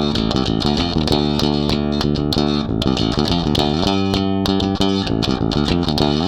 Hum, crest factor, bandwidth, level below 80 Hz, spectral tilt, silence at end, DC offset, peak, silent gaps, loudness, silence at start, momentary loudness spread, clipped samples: none; 16 dB; 16.5 kHz; -32 dBFS; -6 dB/octave; 0 s; under 0.1%; -2 dBFS; none; -18 LUFS; 0 s; 2 LU; under 0.1%